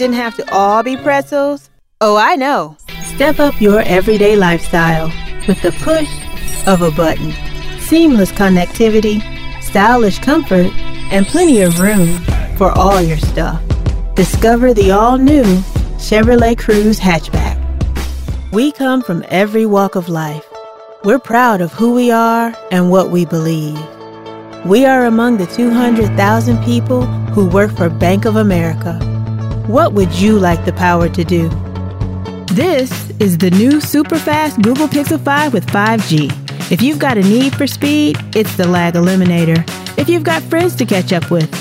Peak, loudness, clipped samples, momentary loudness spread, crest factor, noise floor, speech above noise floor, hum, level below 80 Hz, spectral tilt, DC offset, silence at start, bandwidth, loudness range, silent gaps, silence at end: 0 dBFS; -12 LUFS; under 0.1%; 10 LU; 12 dB; -32 dBFS; 21 dB; none; -24 dBFS; -6 dB/octave; under 0.1%; 0 s; 16.5 kHz; 3 LU; none; 0 s